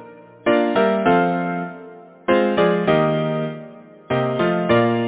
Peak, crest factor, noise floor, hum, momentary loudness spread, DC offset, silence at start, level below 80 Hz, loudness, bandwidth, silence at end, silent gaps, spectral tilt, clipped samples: -4 dBFS; 16 dB; -40 dBFS; none; 12 LU; under 0.1%; 0 s; -54 dBFS; -19 LUFS; 4 kHz; 0 s; none; -10.5 dB/octave; under 0.1%